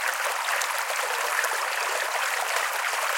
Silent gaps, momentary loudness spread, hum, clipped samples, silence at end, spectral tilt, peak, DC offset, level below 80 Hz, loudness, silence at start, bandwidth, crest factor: none; 1 LU; none; under 0.1%; 0 s; 3.5 dB/octave; -8 dBFS; under 0.1%; -88 dBFS; -25 LUFS; 0 s; 17 kHz; 20 dB